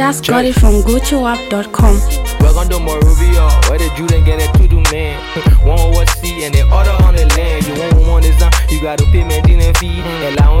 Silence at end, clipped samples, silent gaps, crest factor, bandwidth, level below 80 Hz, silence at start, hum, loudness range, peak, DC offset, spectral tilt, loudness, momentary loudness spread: 0 s; under 0.1%; none; 10 dB; 16 kHz; -10 dBFS; 0 s; none; 1 LU; 0 dBFS; under 0.1%; -5.5 dB/octave; -12 LUFS; 6 LU